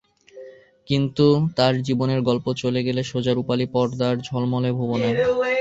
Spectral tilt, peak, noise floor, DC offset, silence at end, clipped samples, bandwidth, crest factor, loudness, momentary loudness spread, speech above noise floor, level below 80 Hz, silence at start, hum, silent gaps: -7 dB/octave; -4 dBFS; -43 dBFS; under 0.1%; 0 s; under 0.1%; 8 kHz; 18 dB; -22 LUFS; 6 LU; 23 dB; -54 dBFS; 0.35 s; none; none